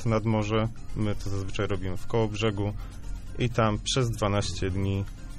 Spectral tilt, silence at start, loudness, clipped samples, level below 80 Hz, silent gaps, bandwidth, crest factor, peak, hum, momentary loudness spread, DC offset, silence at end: -5.5 dB/octave; 0 s; -29 LUFS; under 0.1%; -38 dBFS; none; 13 kHz; 16 dB; -12 dBFS; none; 7 LU; under 0.1%; 0 s